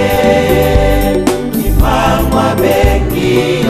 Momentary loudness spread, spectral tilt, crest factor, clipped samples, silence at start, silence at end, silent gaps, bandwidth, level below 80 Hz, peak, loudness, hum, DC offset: 3 LU; -6 dB/octave; 10 dB; under 0.1%; 0 s; 0 s; none; 14.5 kHz; -16 dBFS; 0 dBFS; -11 LUFS; none; under 0.1%